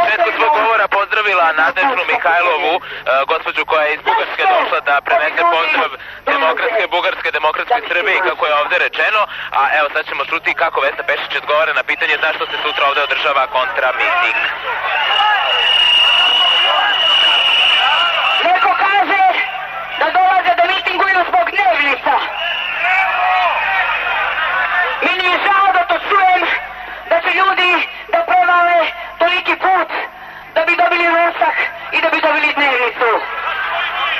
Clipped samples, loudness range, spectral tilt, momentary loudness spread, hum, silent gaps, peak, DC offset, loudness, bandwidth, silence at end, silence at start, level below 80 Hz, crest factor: under 0.1%; 4 LU; -2 dB/octave; 8 LU; 50 Hz at -60 dBFS; none; -2 dBFS; under 0.1%; -13 LUFS; 13 kHz; 0 s; 0 s; -52 dBFS; 12 dB